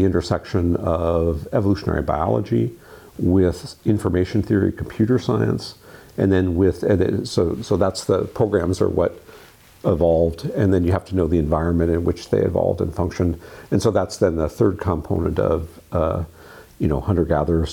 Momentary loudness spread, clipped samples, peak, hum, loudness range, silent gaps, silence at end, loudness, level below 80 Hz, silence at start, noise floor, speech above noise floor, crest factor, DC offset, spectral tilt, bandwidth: 6 LU; under 0.1%; -6 dBFS; none; 2 LU; none; 0 s; -21 LUFS; -36 dBFS; 0 s; -46 dBFS; 27 dB; 14 dB; under 0.1%; -7.5 dB/octave; 17 kHz